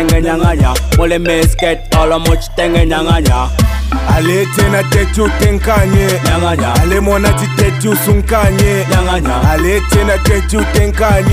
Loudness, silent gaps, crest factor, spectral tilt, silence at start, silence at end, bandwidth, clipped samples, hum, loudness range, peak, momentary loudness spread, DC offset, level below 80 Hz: -11 LUFS; none; 10 dB; -5.5 dB/octave; 0 s; 0 s; 16 kHz; under 0.1%; none; 1 LU; 0 dBFS; 2 LU; under 0.1%; -16 dBFS